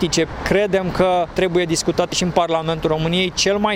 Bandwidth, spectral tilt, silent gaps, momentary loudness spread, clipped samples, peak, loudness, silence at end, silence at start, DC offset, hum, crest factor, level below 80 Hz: 16 kHz; -4 dB/octave; none; 3 LU; under 0.1%; -2 dBFS; -18 LUFS; 0 s; 0 s; under 0.1%; none; 16 dB; -38 dBFS